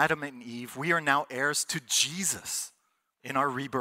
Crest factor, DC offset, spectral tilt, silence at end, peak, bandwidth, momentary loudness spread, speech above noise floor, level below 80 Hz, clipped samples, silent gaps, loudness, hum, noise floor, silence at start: 22 dB; under 0.1%; -2 dB/octave; 0 s; -8 dBFS; 16 kHz; 14 LU; 45 dB; -70 dBFS; under 0.1%; none; -28 LUFS; none; -74 dBFS; 0 s